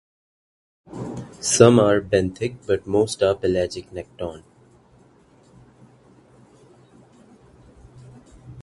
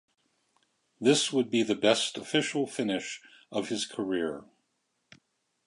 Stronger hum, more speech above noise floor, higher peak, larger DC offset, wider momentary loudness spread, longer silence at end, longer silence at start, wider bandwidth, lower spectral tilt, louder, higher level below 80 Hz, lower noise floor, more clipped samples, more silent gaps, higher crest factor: neither; second, 35 dB vs 49 dB; first, 0 dBFS vs -8 dBFS; neither; first, 20 LU vs 11 LU; second, 0 s vs 1.25 s; about the same, 0.9 s vs 1 s; about the same, 11.5 kHz vs 11.5 kHz; first, -5 dB/octave vs -3.5 dB/octave; first, -20 LUFS vs -29 LUFS; first, -50 dBFS vs -74 dBFS; second, -54 dBFS vs -78 dBFS; neither; neither; about the same, 24 dB vs 22 dB